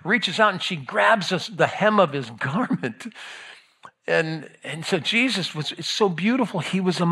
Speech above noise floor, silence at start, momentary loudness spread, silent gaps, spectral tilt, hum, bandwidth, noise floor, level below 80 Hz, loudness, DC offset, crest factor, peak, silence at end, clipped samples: 27 dB; 0.05 s; 15 LU; none; -4.5 dB/octave; none; 13 kHz; -50 dBFS; -74 dBFS; -22 LUFS; under 0.1%; 20 dB; -2 dBFS; 0 s; under 0.1%